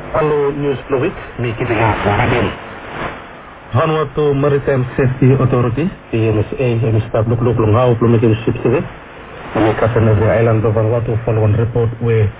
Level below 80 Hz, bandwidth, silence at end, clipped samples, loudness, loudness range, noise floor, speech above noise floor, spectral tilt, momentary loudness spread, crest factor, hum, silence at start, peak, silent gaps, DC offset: -34 dBFS; 4 kHz; 0 s; under 0.1%; -15 LUFS; 3 LU; -34 dBFS; 20 dB; -12 dB/octave; 12 LU; 14 dB; none; 0 s; 0 dBFS; none; under 0.1%